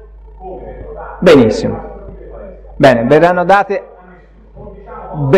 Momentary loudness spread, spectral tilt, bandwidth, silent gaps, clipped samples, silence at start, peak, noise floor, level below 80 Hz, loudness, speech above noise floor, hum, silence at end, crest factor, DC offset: 25 LU; -7 dB/octave; 14.5 kHz; none; under 0.1%; 0.4 s; 0 dBFS; -40 dBFS; -34 dBFS; -10 LUFS; 30 dB; none; 0 s; 14 dB; under 0.1%